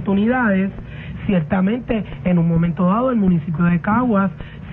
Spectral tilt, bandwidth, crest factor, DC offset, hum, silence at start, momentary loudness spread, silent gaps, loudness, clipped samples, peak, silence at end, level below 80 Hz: -11.5 dB/octave; 3.8 kHz; 14 dB; under 0.1%; none; 0 s; 8 LU; none; -18 LUFS; under 0.1%; -4 dBFS; 0 s; -38 dBFS